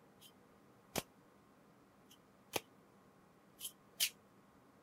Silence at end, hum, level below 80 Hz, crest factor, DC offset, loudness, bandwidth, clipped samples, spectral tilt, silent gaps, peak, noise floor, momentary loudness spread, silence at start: 0.7 s; none; -80 dBFS; 36 dB; under 0.1%; -43 LUFS; 16 kHz; under 0.1%; -1 dB/octave; none; -14 dBFS; -66 dBFS; 28 LU; 0.2 s